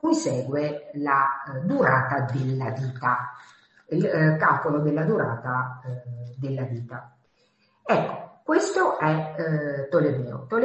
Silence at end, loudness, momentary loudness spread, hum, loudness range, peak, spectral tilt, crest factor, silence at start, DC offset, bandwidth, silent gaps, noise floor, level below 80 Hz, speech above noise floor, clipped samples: 0 s; -25 LUFS; 13 LU; none; 5 LU; -6 dBFS; -7 dB/octave; 18 dB; 0.05 s; under 0.1%; 8.4 kHz; none; -65 dBFS; -64 dBFS; 41 dB; under 0.1%